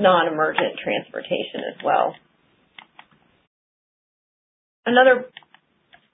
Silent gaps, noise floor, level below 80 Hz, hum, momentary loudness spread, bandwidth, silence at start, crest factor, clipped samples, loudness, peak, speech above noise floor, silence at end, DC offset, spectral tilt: 3.47-4.83 s; -62 dBFS; -72 dBFS; none; 12 LU; 3.9 kHz; 0 s; 22 dB; under 0.1%; -21 LUFS; -2 dBFS; 42 dB; 0.85 s; under 0.1%; -9 dB/octave